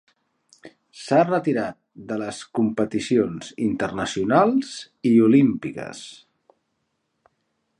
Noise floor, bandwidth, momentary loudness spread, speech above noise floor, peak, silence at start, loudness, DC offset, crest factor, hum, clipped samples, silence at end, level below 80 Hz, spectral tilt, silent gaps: -74 dBFS; 11 kHz; 17 LU; 53 dB; -2 dBFS; 0.65 s; -22 LUFS; under 0.1%; 20 dB; none; under 0.1%; 1.65 s; -60 dBFS; -6 dB/octave; none